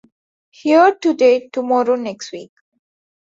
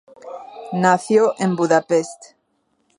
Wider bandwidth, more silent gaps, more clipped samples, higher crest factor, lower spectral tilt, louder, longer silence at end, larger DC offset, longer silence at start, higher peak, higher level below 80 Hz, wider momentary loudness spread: second, 7.8 kHz vs 11.5 kHz; neither; neither; about the same, 16 dB vs 20 dB; second, -4 dB/octave vs -5.5 dB/octave; first, -15 LUFS vs -18 LUFS; first, 0.9 s vs 0.75 s; neither; first, 0.65 s vs 0.25 s; about the same, -2 dBFS vs 0 dBFS; about the same, -68 dBFS vs -72 dBFS; about the same, 18 LU vs 20 LU